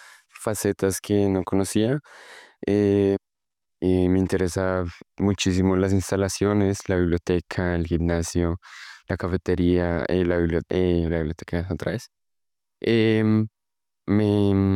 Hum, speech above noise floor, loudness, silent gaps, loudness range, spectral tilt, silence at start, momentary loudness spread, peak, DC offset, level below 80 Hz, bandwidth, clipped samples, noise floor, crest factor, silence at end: none; 66 dB; -23 LUFS; none; 2 LU; -6.5 dB/octave; 0.4 s; 9 LU; -10 dBFS; under 0.1%; -48 dBFS; 15.5 kHz; under 0.1%; -88 dBFS; 14 dB; 0 s